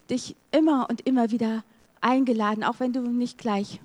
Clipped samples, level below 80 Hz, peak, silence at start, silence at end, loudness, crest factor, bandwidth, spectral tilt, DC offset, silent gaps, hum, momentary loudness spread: under 0.1%; -70 dBFS; -8 dBFS; 0.1 s; 0.1 s; -25 LUFS; 18 dB; 10.5 kHz; -5.5 dB/octave; under 0.1%; none; none; 7 LU